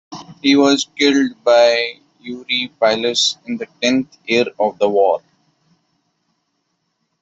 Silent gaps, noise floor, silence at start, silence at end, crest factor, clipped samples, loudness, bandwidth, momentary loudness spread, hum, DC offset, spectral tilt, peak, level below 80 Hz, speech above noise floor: none; -70 dBFS; 0.1 s; 2.05 s; 16 dB; under 0.1%; -16 LUFS; 8.2 kHz; 13 LU; none; under 0.1%; -3 dB/octave; -2 dBFS; -64 dBFS; 54 dB